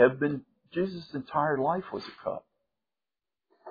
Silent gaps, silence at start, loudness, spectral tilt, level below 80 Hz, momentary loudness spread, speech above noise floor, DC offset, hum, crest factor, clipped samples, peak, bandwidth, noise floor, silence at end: none; 0 s; -31 LUFS; -8.5 dB/octave; -68 dBFS; 12 LU; over 62 dB; under 0.1%; none; 22 dB; under 0.1%; -10 dBFS; 5 kHz; under -90 dBFS; 0 s